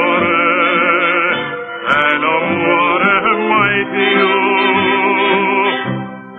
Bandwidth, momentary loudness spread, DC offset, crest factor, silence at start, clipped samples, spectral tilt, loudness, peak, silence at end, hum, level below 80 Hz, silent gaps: 4.4 kHz; 5 LU; under 0.1%; 14 dB; 0 s; under 0.1%; -7 dB/octave; -13 LUFS; 0 dBFS; 0 s; none; -54 dBFS; none